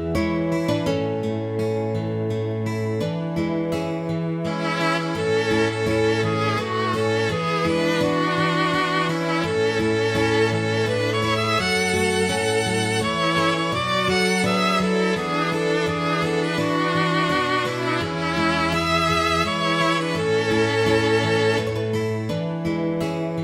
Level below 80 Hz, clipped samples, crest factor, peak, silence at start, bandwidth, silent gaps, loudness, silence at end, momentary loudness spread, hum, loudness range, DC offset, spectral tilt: -48 dBFS; under 0.1%; 14 dB; -8 dBFS; 0 s; 16.5 kHz; none; -21 LUFS; 0 s; 6 LU; none; 4 LU; under 0.1%; -5 dB/octave